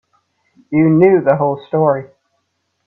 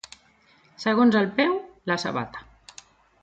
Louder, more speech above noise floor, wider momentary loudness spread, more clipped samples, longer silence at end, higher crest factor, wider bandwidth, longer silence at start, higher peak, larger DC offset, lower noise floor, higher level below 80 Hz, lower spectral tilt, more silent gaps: first, -14 LUFS vs -24 LUFS; first, 56 dB vs 37 dB; second, 8 LU vs 23 LU; neither; about the same, 0.8 s vs 0.8 s; about the same, 16 dB vs 18 dB; second, 4.1 kHz vs 8.6 kHz; about the same, 0.7 s vs 0.8 s; first, 0 dBFS vs -8 dBFS; neither; first, -68 dBFS vs -59 dBFS; about the same, -58 dBFS vs -62 dBFS; first, -11.5 dB/octave vs -5.5 dB/octave; neither